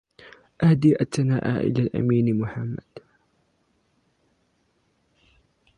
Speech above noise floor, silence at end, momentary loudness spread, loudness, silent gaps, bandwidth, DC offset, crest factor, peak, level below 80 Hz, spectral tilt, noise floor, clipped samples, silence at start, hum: 47 dB; 2.8 s; 12 LU; -22 LUFS; none; 11.5 kHz; under 0.1%; 18 dB; -6 dBFS; -56 dBFS; -8 dB/octave; -68 dBFS; under 0.1%; 0.6 s; none